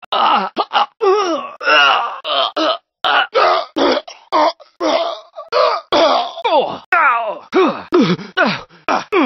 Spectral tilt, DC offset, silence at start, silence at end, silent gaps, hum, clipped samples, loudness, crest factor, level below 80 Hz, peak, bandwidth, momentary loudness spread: -4.5 dB/octave; under 0.1%; 0.1 s; 0 s; 6.86-6.92 s; none; under 0.1%; -15 LUFS; 16 dB; -60 dBFS; 0 dBFS; 6.4 kHz; 7 LU